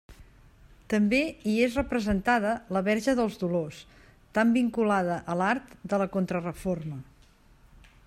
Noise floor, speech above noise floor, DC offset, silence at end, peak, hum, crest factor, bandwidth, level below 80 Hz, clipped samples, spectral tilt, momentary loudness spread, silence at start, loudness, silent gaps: -58 dBFS; 31 dB; under 0.1%; 1.05 s; -10 dBFS; none; 18 dB; 13.5 kHz; -50 dBFS; under 0.1%; -6.5 dB/octave; 8 LU; 0.1 s; -27 LUFS; none